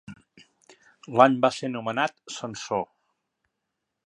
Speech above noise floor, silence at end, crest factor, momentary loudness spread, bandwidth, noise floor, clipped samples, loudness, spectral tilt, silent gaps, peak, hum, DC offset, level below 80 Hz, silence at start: 58 dB; 1.2 s; 26 dB; 16 LU; 11 kHz; -82 dBFS; under 0.1%; -25 LUFS; -5 dB/octave; none; -2 dBFS; none; under 0.1%; -72 dBFS; 0.1 s